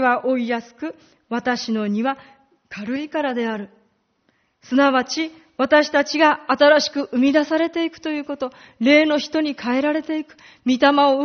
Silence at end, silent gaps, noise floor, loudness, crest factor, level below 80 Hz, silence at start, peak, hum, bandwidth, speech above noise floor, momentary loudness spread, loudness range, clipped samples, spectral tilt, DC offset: 0 s; none; -65 dBFS; -19 LUFS; 18 dB; -64 dBFS; 0 s; -2 dBFS; none; 6.6 kHz; 46 dB; 14 LU; 8 LU; under 0.1%; -2 dB/octave; under 0.1%